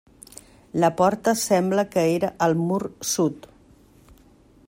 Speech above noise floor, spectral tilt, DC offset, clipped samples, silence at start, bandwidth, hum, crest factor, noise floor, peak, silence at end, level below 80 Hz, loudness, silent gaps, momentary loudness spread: 32 dB; -5 dB/octave; under 0.1%; under 0.1%; 0.75 s; 16 kHz; none; 18 dB; -54 dBFS; -6 dBFS; 1.3 s; -58 dBFS; -22 LUFS; none; 21 LU